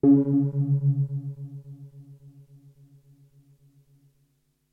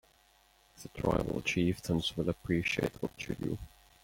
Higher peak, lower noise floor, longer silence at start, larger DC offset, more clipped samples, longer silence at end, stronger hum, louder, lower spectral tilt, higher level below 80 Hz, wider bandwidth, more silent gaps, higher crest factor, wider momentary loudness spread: first, -8 dBFS vs -14 dBFS; first, -70 dBFS vs -66 dBFS; second, 0.05 s vs 0.75 s; neither; neither; first, 2.6 s vs 0.35 s; neither; first, -24 LUFS vs -34 LUFS; first, -13.5 dB/octave vs -5.5 dB/octave; second, -68 dBFS vs -52 dBFS; second, 1.6 kHz vs 17 kHz; neither; about the same, 18 dB vs 20 dB; first, 26 LU vs 11 LU